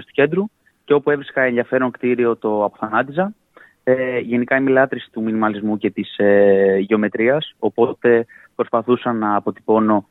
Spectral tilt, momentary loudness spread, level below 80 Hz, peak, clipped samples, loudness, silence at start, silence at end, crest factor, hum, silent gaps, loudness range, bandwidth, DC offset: -9 dB/octave; 8 LU; -66 dBFS; -2 dBFS; under 0.1%; -18 LUFS; 0 s; 0.1 s; 16 dB; none; none; 3 LU; 4.1 kHz; under 0.1%